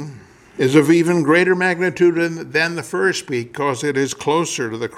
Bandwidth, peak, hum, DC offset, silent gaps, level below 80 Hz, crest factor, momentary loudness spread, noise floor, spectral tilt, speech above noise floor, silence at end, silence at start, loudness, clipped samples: 14 kHz; -2 dBFS; none; under 0.1%; none; -60 dBFS; 16 dB; 9 LU; -39 dBFS; -5 dB/octave; 22 dB; 0 s; 0 s; -17 LUFS; under 0.1%